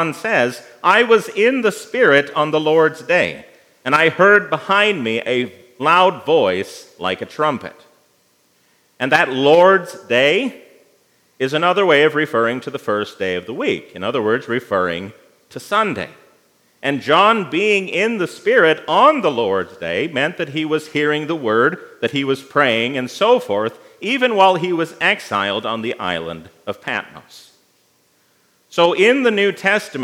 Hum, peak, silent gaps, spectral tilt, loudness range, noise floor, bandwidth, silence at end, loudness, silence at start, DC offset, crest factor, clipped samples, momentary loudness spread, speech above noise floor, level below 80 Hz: none; 0 dBFS; none; -4.5 dB/octave; 6 LU; -59 dBFS; 15.5 kHz; 0 s; -16 LUFS; 0 s; under 0.1%; 18 dB; under 0.1%; 12 LU; 42 dB; -70 dBFS